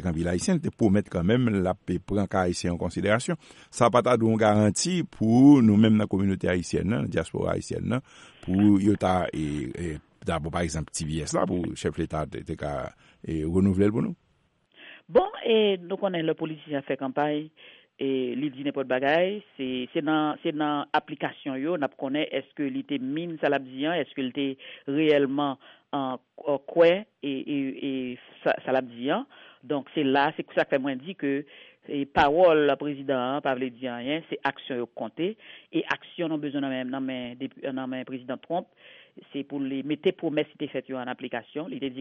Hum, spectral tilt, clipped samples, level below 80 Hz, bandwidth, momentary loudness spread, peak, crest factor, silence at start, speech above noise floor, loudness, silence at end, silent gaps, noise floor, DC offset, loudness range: none; -6 dB/octave; under 0.1%; -52 dBFS; 11.5 kHz; 12 LU; -6 dBFS; 20 dB; 0 s; 42 dB; -27 LUFS; 0 s; none; -68 dBFS; under 0.1%; 9 LU